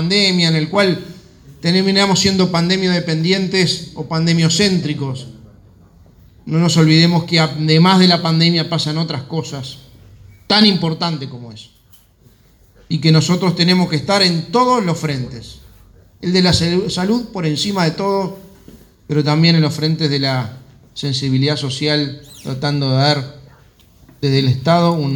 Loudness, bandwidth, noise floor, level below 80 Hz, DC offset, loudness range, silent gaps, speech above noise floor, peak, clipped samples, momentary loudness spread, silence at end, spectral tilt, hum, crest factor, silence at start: -15 LUFS; 17.5 kHz; -50 dBFS; -48 dBFS; under 0.1%; 5 LU; none; 35 dB; 0 dBFS; under 0.1%; 13 LU; 0 s; -5 dB/octave; none; 16 dB; 0 s